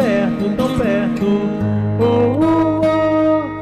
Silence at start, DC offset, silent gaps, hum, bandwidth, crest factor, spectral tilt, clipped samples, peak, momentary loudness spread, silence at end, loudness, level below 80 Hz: 0 s; under 0.1%; none; none; 13 kHz; 8 dB; -8 dB/octave; under 0.1%; -8 dBFS; 4 LU; 0 s; -16 LUFS; -40 dBFS